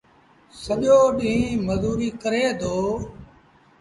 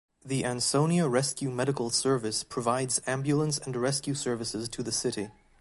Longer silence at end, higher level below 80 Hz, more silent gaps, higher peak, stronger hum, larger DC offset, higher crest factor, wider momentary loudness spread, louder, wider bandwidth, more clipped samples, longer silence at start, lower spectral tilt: first, 0.55 s vs 0.3 s; first, -44 dBFS vs -62 dBFS; neither; first, -6 dBFS vs -12 dBFS; neither; neither; about the same, 16 dB vs 18 dB; first, 13 LU vs 7 LU; first, -22 LUFS vs -29 LUFS; about the same, 11.5 kHz vs 12 kHz; neither; first, 0.55 s vs 0.25 s; first, -6 dB/octave vs -4 dB/octave